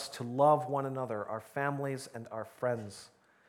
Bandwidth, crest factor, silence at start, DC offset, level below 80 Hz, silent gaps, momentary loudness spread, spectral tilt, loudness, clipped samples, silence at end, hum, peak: 16.5 kHz; 20 dB; 0 s; under 0.1%; -80 dBFS; none; 16 LU; -6 dB/octave; -34 LUFS; under 0.1%; 0.4 s; none; -14 dBFS